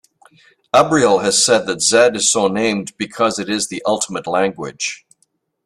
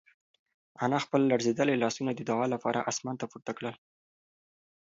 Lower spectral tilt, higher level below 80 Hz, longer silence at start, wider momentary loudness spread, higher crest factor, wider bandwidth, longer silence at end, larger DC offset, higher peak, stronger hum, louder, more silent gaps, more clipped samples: second, -2.5 dB/octave vs -5 dB/octave; first, -56 dBFS vs -76 dBFS; about the same, 0.75 s vs 0.8 s; about the same, 11 LU vs 11 LU; about the same, 18 dB vs 20 dB; first, 13.5 kHz vs 7.8 kHz; second, 0.7 s vs 1.1 s; neither; first, 0 dBFS vs -12 dBFS; neither; first, -16 LUFS vs -30 LUFS; neither; neither